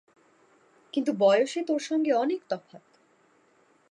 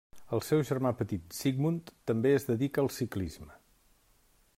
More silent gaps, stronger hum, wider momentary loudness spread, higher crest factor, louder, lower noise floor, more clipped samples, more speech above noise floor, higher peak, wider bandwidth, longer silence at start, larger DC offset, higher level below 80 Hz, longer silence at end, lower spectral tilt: neither; neither; first, 12 LU vs 9 LU; about the same, 18 dB vs 16 dB; first, -26 LUFS vs -32 LUFS; about the same, -64 dBFS vs -66 dBFS; neither; about the same, 38 dB vs 36 dB; first, -10 dBFS vs -16 dBFS; second, 11 kHz vs 16 kHz; first, 0.95 s vs 0.15 s; neither; second, -86 dBFS vs -62 dBFS; first, 1.15 s vs 1 s; second, -5 dB/octave vs -6.5 dB/octave